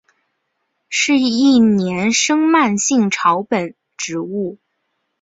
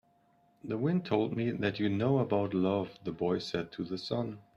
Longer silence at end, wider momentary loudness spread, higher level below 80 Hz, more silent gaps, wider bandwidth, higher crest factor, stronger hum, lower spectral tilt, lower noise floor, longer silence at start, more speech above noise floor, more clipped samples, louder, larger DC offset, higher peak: first, 0.65 s vs 0.15 s; first, 12 LU vs 9 LU; first, -58 dBFS vs -66 dBFS; neither; second, 8 kHz vs 10.5 kHz; about the same, 16 dB vs 18 dB; neither; second, -3.5 dB/octave vs -7.5 dB/octave; about the same, -71 dBFS vs -68 dBFS; first, 0.9 s vs 0.65 s; first, 56 dB vs 36 dB; neither; first, -15 LUFS vs -32 LUFS; neither; first, -2 dBFS vs -14 dBFS